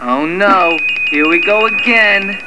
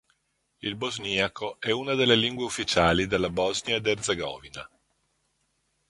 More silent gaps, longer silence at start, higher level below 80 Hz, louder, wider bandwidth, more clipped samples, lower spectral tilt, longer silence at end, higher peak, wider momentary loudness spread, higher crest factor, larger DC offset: neither; second, 0 s vs 0.65 s; second, -56 dBFS vs -50 dBFS; first, -10 LUFS vs -26 LUFS; about the same, 11 kHz vs 11.5 kHz; neither; about the same, -4.5 dB/octave vs -3.5 dB/octave; second, 0 s vs 1.25 s; first, 0 dBFS vs -6 dBFS; second, 4 LU vs 13 LU; second, 12 dB vs 22 dB; first, 2% vs under 0.1%